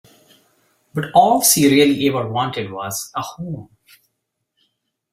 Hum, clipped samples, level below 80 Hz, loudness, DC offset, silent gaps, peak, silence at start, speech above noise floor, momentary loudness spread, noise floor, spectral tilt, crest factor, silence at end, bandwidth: none; under 0.1%; -58 dBFS; -16 LUFS; under 0.1%; none; 0 dBFS; 0.95 s; 58 dB; 17 LU; -75 dBFS; -3.5 dB/octave; 20 dB; 1.5 s; 16 kHz